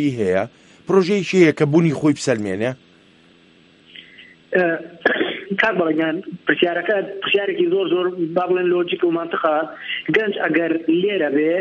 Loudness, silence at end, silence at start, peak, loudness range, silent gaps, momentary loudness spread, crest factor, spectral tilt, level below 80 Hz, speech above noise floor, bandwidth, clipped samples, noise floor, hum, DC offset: -19 LUFS; 0 s; 0 s; 0 dBFS; 4 LU; none; 7 LU; 18 dB; -6 dB/octave; -64 dBFS; 33 dB; 10.5 kHz; under 0.1%; -51 dBFS; none; under 0.1%